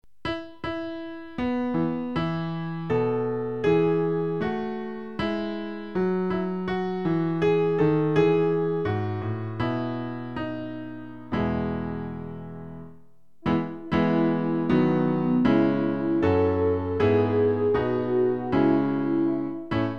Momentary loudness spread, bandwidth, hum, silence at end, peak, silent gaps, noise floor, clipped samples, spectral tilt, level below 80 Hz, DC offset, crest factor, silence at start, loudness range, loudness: 12 LU; 6.6 kHz; none; 0 s; -8 dBFS; none; -58 dBFS; under 0.1%; -9 dB/octave; -50 dBFS; 0.5%; 16 dB; 0.25 s; 7 LU; -25 LUFS